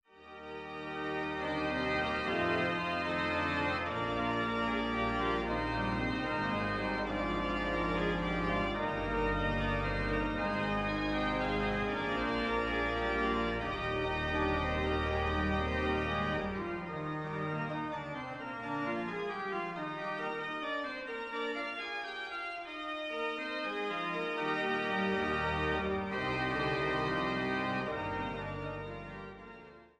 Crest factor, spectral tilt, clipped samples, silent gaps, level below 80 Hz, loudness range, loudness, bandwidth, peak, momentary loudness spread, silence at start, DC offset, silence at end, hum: 14 dB; -6.5 dB/octave; under 0.1%; none; -48 dBFS; 5 LU; -34 LUFS; 11.5 kHz; -20 dBFS; 7 LU; 0.15 s; under 0.1%; 0.15 s; none